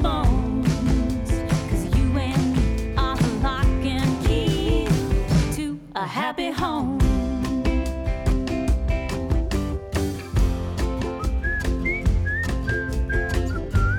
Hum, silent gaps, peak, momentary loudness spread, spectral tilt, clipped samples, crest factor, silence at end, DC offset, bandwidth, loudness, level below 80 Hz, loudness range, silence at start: none; none; -10 dBFS; 5 LU; -6.5 dB/octave; under 0.1%; 12 dB; 0 s; under 0.1%; 15.5 kHz; -24 LUFS; -26 dBFS; 3 LU; 0 s